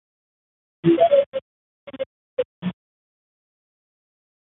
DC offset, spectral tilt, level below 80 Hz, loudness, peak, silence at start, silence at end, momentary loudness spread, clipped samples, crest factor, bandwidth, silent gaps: under 0.1%; -11.5 dB/octave; -66 dBFS; -21 LUFS; -4 dBFS; 0.85 s; 1.8 s; 17 LU; under 0.1%; 20 dB; 4 kHz; 1.26-1.32 s, 1.42-1.87 s, 2.06-2.37 s, 2.45-2.62 s